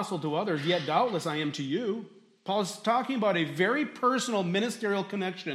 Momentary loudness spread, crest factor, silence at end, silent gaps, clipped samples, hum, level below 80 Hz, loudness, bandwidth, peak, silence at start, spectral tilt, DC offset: 6 LU; 16 dB; 0 s; none; under 0.1%; none; -80 dBFS; -29 LUFS; 15 kHz; -12 dBFS; 0 s; -5 dB/octave; under 0.1%